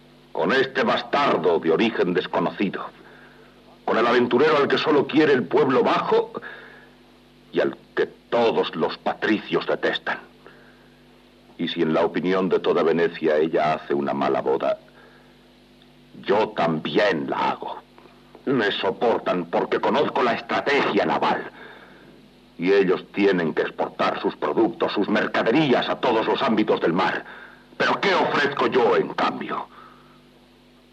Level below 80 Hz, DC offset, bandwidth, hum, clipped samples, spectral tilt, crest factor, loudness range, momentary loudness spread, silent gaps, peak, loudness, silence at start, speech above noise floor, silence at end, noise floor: -64 dBFS; under 0.1%; 8.6 kHz; none; under 0.1%; -6 dB/octave; 16 dB; 5 LU; 11 LU; none; -8 dBFS; -22 LUFS; 0.35 s; 32 dB; 1.05 s; -53 dBFS